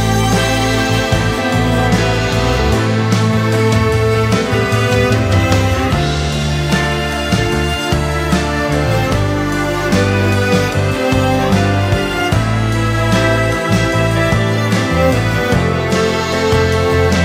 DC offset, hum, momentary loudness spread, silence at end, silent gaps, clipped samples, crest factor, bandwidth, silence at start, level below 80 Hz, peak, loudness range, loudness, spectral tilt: under 0.1%; none; 3 LU; 0 s; none; under 0.1%; 14 dB; 16 kHz; 0 s; -26 dBFS; 0 dBFS; 2 LU; -14 LUFS; -5.5 dB/octave